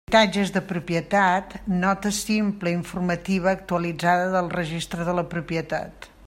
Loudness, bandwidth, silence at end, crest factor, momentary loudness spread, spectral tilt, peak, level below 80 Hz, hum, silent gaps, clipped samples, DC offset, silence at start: -24 LUFS; 16 kHz; 0 s; 20 dB; 8 LU; -5 dB/octave; -4 dBFS; -48 dBFS; none; none; under 0.1%; under 0.1%; 0.1 s